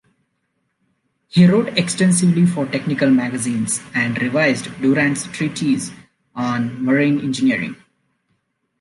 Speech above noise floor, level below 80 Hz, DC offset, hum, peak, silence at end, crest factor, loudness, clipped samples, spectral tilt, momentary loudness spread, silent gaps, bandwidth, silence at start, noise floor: 53 dB; -60 dBFS; under 0.1%; none; -2 dBFS; 1.05 s; 16 dB; -18 LUFS; under 0.1%; -5.5 dB/octave; 8 LU; none; 11.5 kHz; 1.35 s; -70 dBFS